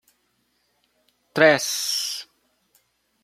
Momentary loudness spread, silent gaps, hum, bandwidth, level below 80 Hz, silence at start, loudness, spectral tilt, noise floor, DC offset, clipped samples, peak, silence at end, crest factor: 14 LU; none; none; 16 kHz; -74 dBFS; 1.35 s; -21 LUFS; -2 dB/octave; -69 dBFS; under 0.1%; under 0.1%; 0 dBFS; 1 s; 24 dB